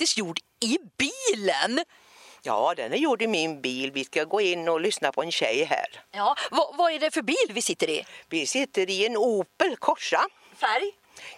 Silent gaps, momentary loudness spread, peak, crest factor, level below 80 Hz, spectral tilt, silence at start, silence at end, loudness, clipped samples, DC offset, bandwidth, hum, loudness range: none; 5 LU; -6 dBFS; 20 dB; -74 dBFS; -2 dB/octave; 0 s; 0 s; -26 LUFS; under 0.1%; under 0.1%; 14.5 kHz; none; 1 LU